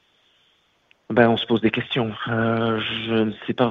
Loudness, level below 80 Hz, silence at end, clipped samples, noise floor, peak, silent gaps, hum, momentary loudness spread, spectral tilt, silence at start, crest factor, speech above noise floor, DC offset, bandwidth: -22 LUFS; -58 dBFS; 0 s; under 0.1%; -63 dBFS; 0 dBFS; none; none; 7 LU; -8 dB/octave; 1.1 s; 22 dB; 42 dB; under 0.1%; 4.9 kHz